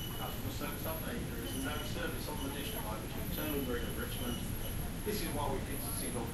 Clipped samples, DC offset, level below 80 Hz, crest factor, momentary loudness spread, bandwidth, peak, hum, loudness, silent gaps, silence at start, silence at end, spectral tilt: under 0.1%; under 0.1%; -44 dBFS; 14 dB; 3 LU; 16 kHz; -24 dBFS; none; -38 LUFS; none; 0 s; 0 s; -4.5 dB/octave